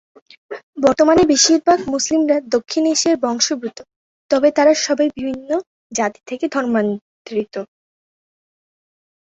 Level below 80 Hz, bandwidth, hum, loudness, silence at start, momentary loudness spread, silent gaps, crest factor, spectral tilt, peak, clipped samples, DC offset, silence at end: -56 dBFS; 8.2 kHz; none; -17 LUFS; 0.5 s; 16 LU; 0.63-0.73 s, 3.96-4.29 s, 5.67-5.90 s, 7.01-7.25 s; 16 dB; -2.5 dB/octave; -2 dBFS; under 0.1%; under 0.1%; 1.6 s